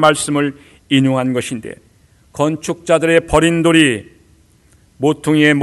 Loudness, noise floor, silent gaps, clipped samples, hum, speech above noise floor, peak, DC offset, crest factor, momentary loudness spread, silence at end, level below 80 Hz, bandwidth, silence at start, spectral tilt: -15 LUFS; -51 dBFS; none; under 0.1%; none; 37 dB; 0 dBFS; under 0.1%; 16 dB; 13 LU; 0 s; -40 dBFS; 12.5 kHz; 0 s; -5 dB/octave